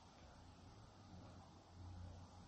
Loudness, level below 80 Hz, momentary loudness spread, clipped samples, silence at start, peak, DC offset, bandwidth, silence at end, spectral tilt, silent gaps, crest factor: -61 LUFS; -68 dBFS; 6 LU; under 0.1%; 0 s; -46 dBFS; under 0.1%; 8.4 kHz; 0 s; -6 dB/octave; none; 14 dB